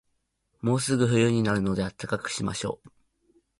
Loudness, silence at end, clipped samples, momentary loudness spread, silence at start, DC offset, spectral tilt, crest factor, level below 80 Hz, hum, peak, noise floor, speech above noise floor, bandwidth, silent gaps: -26 LUFS; 0.7 s; under 0.1%; 10 LU; 0.65 s; under 0.1%; -5.5 dB/octave; 18 dB; -54 dBFS; none; -10 dBFS; -75 dBFS; 50 dB; 11.5 kHz; none